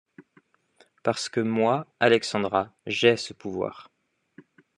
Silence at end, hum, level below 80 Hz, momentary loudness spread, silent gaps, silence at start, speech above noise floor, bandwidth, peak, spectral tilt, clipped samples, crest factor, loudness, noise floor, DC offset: 0.95 s; none; -72 dBFS; 10 LU; none; 0.2 s; 38 dB; 11 kHz; -6 dBFS; -4.5 dB/octave; under 0.1%; 22 dB; -25 LUFS; -63 dBFS; under 0.1%